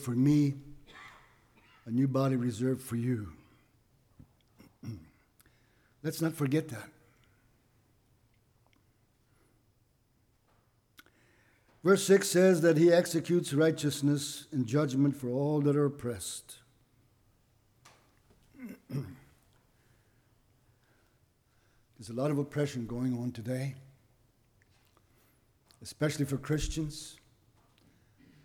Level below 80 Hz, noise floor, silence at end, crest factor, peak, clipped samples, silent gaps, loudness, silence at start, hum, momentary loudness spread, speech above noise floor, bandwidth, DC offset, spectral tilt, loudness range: -58 dBFS; -71 dBFS; 1.3 s; 20 dB; -12 dBFS; under 0.1%; none; -30 LUFS; 0 s; none; 24 LU; 41 dB; 19 kHz; under 0.1%; -6 dB/octave; 21 LU